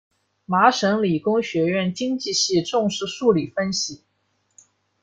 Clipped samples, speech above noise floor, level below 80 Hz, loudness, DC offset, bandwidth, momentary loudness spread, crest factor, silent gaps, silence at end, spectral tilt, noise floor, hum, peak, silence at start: under 0.1%; 48 dB; -62 dBFS; -21 LUFS; under 0.1%; 9.4 kHz; 7 LU; 20 dB; none; 1.05 s; -4 dB/octave; -69 dBFS; none; -2 dBFS; 0.5 s